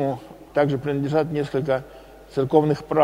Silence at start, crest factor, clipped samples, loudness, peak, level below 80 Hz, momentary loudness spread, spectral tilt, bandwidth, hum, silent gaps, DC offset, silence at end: 0 s; 20 dB; under 0.1%; -23 LUFS; -2 dBFS; -52 dBFS; 9 LU; -8 dB/octave; 15.5 kHz; none; none; under 0.1%; 0 s